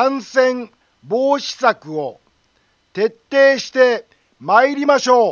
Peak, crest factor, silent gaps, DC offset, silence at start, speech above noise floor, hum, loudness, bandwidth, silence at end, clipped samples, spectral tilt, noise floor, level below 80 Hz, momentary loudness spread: 0 dBFS; 16 dB; none; under 0.1%; 0 s; 45 dB; none; -16 LUFS; 7.2 kHz; 0 s; under 0.1%; -3.5 dB/octave; -61 dBFS; -70 dBFS; 14 LU